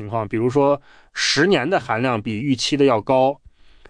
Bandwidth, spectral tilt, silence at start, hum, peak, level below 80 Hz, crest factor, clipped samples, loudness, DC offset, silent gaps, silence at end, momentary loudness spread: 10.5 kHz; -4.5 dB/octave; 0 s; none; -6 dBFS; -52 dBFS; 14 dB; under 0.1%; -19 LUFS; under 0.1%; none; 0.55 s; 8 LU